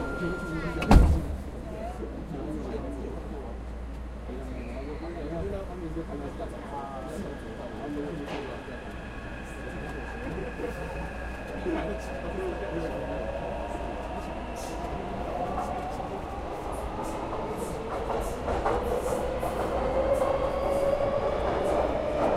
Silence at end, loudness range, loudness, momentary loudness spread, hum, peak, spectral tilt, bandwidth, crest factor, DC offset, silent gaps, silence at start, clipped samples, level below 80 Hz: 0 s; 9 LU; -32 LUFS; 11 LU; none; -6 dBFS; -6.5 dB/octave; 15 kHz; 24 dB; under 0.1%; none; 0 s; under 0.1%; -36 dBFS